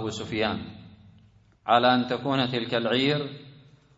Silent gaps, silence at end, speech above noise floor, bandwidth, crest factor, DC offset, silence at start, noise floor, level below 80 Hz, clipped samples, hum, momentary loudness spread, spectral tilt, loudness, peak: none; 0.45 s; 32 dB; 8 kHz; 22 dB; under 0.1%; 0 s; -57 dBFS; -60 dBFS; under 0.1%; none; 17 LU; -5.5 dB/octave; -25 LUFS; -6 dBFS